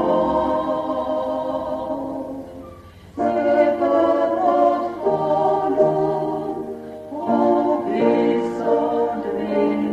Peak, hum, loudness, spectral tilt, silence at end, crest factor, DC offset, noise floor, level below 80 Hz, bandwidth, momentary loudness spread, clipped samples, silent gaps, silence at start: -4 dBFS; none; -20 LUFS; -8 dB/octave; 0 s; 16 dB; under 0.1%; -41 dBFS; -52 dBFS; 8.8 kHz; 13 LU; under 0.1%; none; 0 s